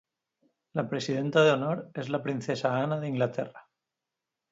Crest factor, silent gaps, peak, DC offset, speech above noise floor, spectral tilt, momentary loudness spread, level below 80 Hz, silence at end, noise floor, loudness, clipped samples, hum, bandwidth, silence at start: 20 dB; none; -10 dBFS; under 0.1%; 59 dB; -6 dB/octave; 11 LU; -74 dBFS; 0.9 s; -88 dBFS; -29 LUFS; under 0.1%; none; 7.8 kHz; 0.75 s